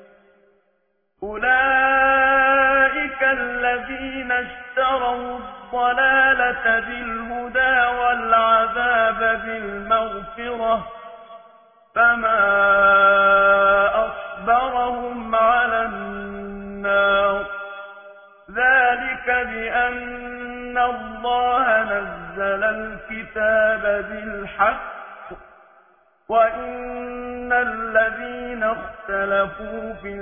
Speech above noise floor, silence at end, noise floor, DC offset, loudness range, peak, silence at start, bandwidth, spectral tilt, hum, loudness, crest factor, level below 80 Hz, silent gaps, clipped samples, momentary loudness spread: 48 dB; 0 s; -68 dBFS; under 0.1%; 7 LU; -4 dBFS; 1.2 s; 3.6 kHz; -7.5 dB/octave; none; -19 LUFS; 16 dB; -48 dBFS; none; under 0.1%; 16 LU